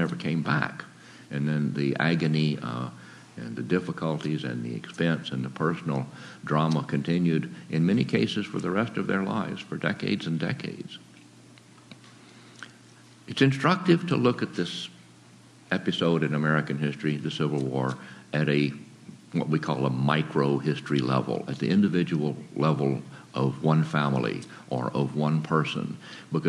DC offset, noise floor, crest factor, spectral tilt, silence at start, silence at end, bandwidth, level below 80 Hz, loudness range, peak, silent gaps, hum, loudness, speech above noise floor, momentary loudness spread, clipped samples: under 0.1%; -52 dBFS; 22 dB; -7 dB/octave; 0 s; 0 s; 11.5 kHz; -70 dBFS; 4 LU; -6 dBFS; none; none; -27 LUFS; 26 dB; 13 LU; under 0.1%